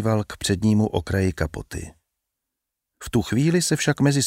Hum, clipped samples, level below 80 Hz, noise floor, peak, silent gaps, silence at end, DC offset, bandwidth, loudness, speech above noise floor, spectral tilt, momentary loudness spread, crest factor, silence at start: none; under 0.1%; -42 dBFS; -83 dBFS; -6 dBFS; none; 0 s; under 0.1%; 16 kHz; -22 LUFS; 62 dB; -5 dB/octave; 15 LU; 16 dB; 0 s